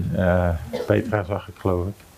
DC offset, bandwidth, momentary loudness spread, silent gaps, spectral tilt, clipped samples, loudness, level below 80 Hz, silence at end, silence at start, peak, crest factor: under 0.1%; 15.5 kHz; 7 LU; none; -8 dB/octave; under 0.1%; -23 LUFS; -44 dBFS; 0.25 s; 0 s; -4 dBFS; 18 dB